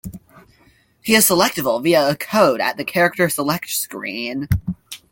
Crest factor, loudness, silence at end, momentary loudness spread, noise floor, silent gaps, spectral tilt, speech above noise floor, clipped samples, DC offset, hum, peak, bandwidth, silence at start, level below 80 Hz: 18 dB; -18 LUFS; 0.15 s; 12 LU; -55 dBFS; none; -3.5 dB/octave; 38 dB; under 0.1%; under 0.1%; none; 0 dBFS; 17 kHz; 0.05 s; -42 dBFS